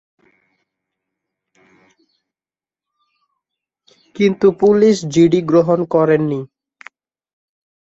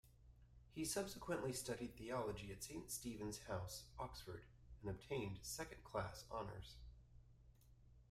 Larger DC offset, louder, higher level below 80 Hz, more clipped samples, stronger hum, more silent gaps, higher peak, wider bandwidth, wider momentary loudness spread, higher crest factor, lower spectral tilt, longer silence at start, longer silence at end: neither; first, -14 LUFS vs -49 LUFS; first, -58 dBFS vs -64 dBFS; neither; neither; neither; first, -2 dBFS vs -30 dBFS; second, 8 kHz vs 16 kHz; second, 8 LU vs 15 LU; about the same, 16 dB vs 20 dB; first, -7 dB/octave vs -4 dB/octave; first, 4.2 s vs 0.05 s; first, 1.5 s vs 0 s